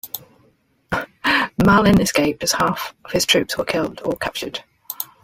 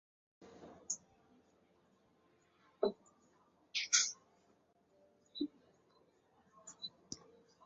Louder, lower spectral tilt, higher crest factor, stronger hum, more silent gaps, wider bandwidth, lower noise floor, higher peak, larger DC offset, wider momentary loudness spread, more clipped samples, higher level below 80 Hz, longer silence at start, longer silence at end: first, -19 LUFS vs -38 LUFS; first, -4 dB/octave vs -0.5 dB/octave; second, 18 dB vs 30 dB; neither; neither; first, 16.5 kHz vs 7.6 kHz; second, -59 dBFS vs -73 dBFS; first, -2 dBFS vs -16 dBFS; neither; second, 15 LU vs 26 LU; neither; first, -44 dBFS vs -84 dBFS; second, 0.05 s vs 0.4 s; second, 0.2 s vs 0.5 s